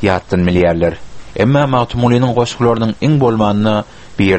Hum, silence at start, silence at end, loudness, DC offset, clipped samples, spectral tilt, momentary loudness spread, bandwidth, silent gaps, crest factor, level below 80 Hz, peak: none; 0 s; 0 s; -14 LUFS; under 0.1%; under 0.1%; -7 dB/octave; 6 LU; 8.6 kHz; none; 14 dB; -36 dBFS; 0 dBFS